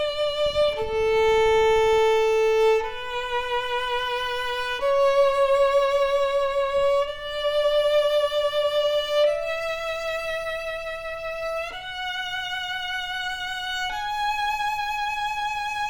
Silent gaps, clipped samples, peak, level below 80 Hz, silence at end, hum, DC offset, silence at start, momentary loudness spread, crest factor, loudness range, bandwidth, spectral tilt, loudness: none; under 0.1%; -10 dBFS; -46 dBFS; 0 s; none; under 0.1%; 0 s; 9 LU; 12 dB; 7 LU; over 20 kHz; -1.5 dB/octave; -23 LUFS